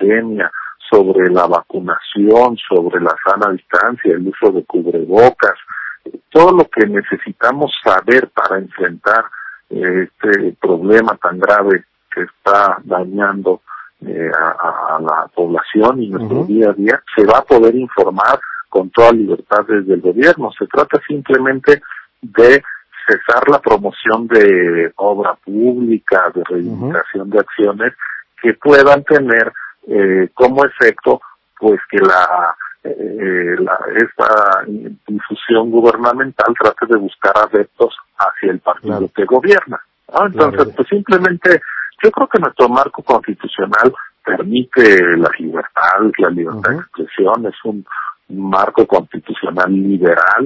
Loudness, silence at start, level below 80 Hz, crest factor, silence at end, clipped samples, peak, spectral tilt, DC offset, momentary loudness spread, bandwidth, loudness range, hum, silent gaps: -12 LUFS; 0 s; -52 dBFS; 12 dB; 0 s; 0.8%; 0 dBFS; -7 dB/octave; under 0.1%; 12 LU; 8 kHz; 4 LU; none; none